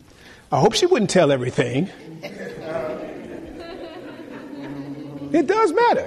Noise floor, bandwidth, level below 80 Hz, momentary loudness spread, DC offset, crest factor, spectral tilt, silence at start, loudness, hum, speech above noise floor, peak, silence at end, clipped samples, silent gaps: -47 dBFS; 13 kHz; -54 dBFS; 19 LU; under 0.1%; 16 dB; -5 dB/octave; 0.25 s; -20 LUFS; none; 28 dB; -6 dBFS; 0 s; under 0.1%; none